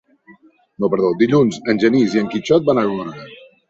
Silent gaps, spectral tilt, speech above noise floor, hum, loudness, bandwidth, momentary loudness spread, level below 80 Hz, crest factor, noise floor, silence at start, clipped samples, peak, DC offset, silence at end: none; -6.5 dB/octave; 33 dB; none; -17 LUFS; 8 kHz; 10 LU; -58 dBFS; 16 dB; -49 dBFS; 0.3 s; under 0.1%; -2 dBFS; under 0.1%; 0.35 s